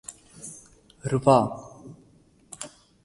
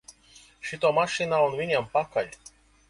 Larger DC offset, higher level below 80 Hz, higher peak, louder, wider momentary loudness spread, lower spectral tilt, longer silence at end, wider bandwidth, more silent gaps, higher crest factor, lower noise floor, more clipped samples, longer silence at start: neither; about the same, -58 dBFS vs -62 dBFS; first, -4 dBFS vs -10 dBFS; first, -23 LUFS vs -26 LUFS; first, 26 LU vs 13 LU; first, -6 dB/octave vs -4 dB/octave; second, 0.35 s vs 0.55 s; about the same, 11.5 kHz vs 11.5 kHz; neither; first, 24 dB vs 18 dB; about the same, -58 dBFS vs -55 dBFS; neither; about the same, 0.1 s vs 0.1 s